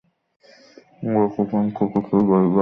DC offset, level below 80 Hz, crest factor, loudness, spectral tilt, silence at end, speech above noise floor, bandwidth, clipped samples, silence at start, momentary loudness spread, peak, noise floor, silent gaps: under 0.1%; -58 dBFS; 16 dB; -20 LUFS; -11 dB/octave; 0 s; 31 dB; 5.8 kHz; under 0.1%; 1 s; 6 LU; -6 dBFS; -49 dBFS; none